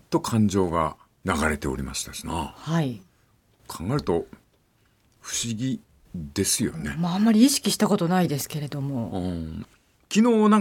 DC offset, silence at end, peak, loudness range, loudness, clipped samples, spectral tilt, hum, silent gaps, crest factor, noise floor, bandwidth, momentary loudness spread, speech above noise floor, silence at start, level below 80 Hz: under 0.1%; 0 s; -6 dBFS; 8 LU; -25 LUFS; under 0.1%; -5 dB/octave; none; none; 18 dB; -64 dBFS; 17.5 kHz; 16 LU; 40 dB; 0.1 s; -48 dBFS